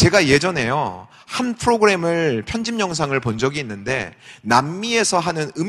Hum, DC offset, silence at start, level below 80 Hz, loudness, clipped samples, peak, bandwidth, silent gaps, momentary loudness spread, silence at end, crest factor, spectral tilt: none; under 0.1%; 0 s; -44 dBFS; -19 LUFS; under 0.1%; 0 dBFS; 13 kHz; none; 10 LU; 0 s; 20 dB; -4.5 dB/octave